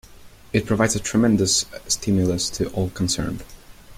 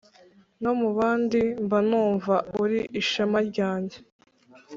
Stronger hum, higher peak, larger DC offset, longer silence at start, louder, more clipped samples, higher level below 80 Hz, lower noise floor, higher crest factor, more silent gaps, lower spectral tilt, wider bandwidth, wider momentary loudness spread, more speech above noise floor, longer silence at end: neither; first, -4 dBFS vs -10 dBFS; neither; second, 0.1 s vs 0.6 s; first, -21 LUFS vs -25 LUFS; neither; first, -42 dBFS vs -62 dBFS; second, -45 dBFS vs -56 dBFS; about the same, 18 dB vs 16 dB; second, none vs 4.12-4.19 s; second, -4 dB/octave vs -6 dB/octave; first, 16.5 kHz vs 7.6 kHz; about the same, 7 LU vs 5 LU; second, 23 dB vs 32 dB; about the same, 0.05 s vs 0 s